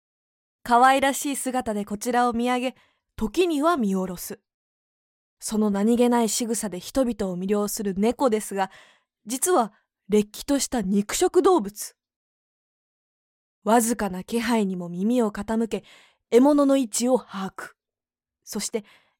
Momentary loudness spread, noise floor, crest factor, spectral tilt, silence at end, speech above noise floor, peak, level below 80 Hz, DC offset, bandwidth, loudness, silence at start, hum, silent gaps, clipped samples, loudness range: 14 LU; under -90 dBFS; 18 dB; -4.5 dB/octave; 0.4 s; over 67 dB; -6 dBFS; -54 dBFS; under 0.1%; 17 kHz; -23 LUFS; 0.65 s; none; 4.54-5.37 s, 12.16-13.62 s; under 0.1%; 3 LU